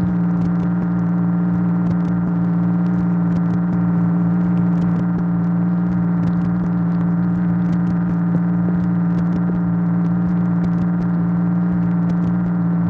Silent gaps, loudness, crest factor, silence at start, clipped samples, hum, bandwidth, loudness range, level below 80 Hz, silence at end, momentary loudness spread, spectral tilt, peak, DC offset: none; -18 LUFS; 10 dB; 0 s; under 0.1%; none; 2.5 kHz; 0 LU; -42 dBFS; 0 s; 1 LU; -11.5 dB/octave; -6 dBFS; under 0.1%